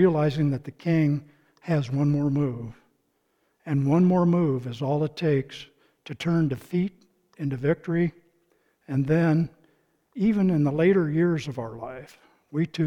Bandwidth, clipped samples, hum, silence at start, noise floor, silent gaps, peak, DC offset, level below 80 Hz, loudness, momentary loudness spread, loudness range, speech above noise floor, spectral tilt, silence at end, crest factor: 7.6 kHz; under 0.1%; none; 0 s; -71 dBFS; none; -8 dBFS; under 0.1%; -56 dBFS; -25 LUFS; 16 LU; 4 LU; 47 dB; -8.5 dB/octave; 0 s; 16 dB